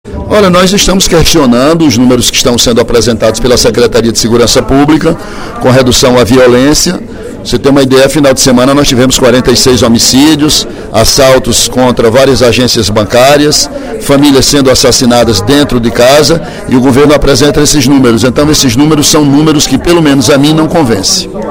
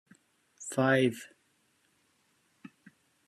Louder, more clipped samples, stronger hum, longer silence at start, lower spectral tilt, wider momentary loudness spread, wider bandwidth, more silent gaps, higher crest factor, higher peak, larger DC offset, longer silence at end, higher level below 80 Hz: first, -5 LUFS vs -28 LUFS; first, 7% vs under 0.1%; neither; second, 0.05 s vs 0.6 s; second, -4 dB/octave vs -5.5 dB/octave; second, 4 LU vs 21 LU; first, over 20 kHz vs 14 kHz; neither; second, 6 dB vs 22 dB; first, 0 dBFS vs -12 dBFS; neither; second, 0 s vs 0.6 s; first, -22 dBFS vs -78 dBFS